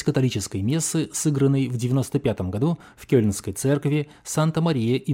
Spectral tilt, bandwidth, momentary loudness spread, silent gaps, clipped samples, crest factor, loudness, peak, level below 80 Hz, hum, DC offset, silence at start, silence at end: -6 dB/octave; 16.5 kHz; 5 LU; none; under 0.1%; 16 dB; -23 LUFS; -6 dBFS; -54 dBFS; none; under 0.1%; 0 s; 0 s